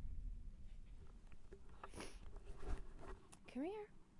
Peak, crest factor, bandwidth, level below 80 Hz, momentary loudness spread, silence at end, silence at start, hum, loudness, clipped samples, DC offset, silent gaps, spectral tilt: -30 dBFS; 20 dB; 11.5 kHz; -54 dBFS; 15 LU; 0 s; 0 s; none; -55 LUFS; under 0.1%; under 0.1%; none; -6 dB/octave